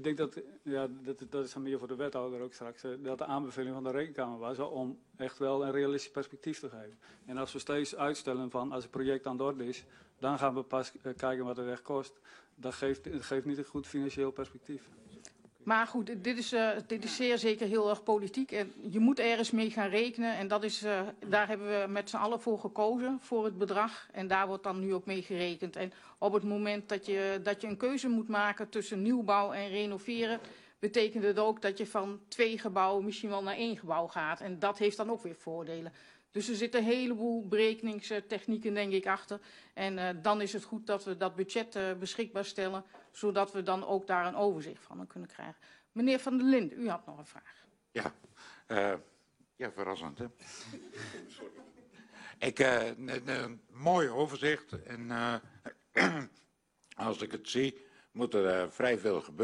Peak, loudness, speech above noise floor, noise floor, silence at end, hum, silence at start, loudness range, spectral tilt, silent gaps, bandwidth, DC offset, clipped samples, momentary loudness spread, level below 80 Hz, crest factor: -12 dBFS; -34 LUFS; 34 dB; -69 dBFS; 0 s; none; 0 s; 6 LU; -5 dB/octave; none; 11.5 kHz; under 0.1%; under 0.1%; 14 LU; -72 dBFS; 22 dB